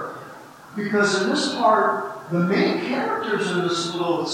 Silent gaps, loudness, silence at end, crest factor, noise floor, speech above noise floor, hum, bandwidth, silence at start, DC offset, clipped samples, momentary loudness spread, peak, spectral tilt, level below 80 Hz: none; -22 LUFS; 0 s; 16 dB; -42 dBFS; 20 dB; none; 16 kHz; 0 s; under 0.1%; under 0.1%; 16 LU; -6 dBFS; -4.5 dB/octave; -72 dBFS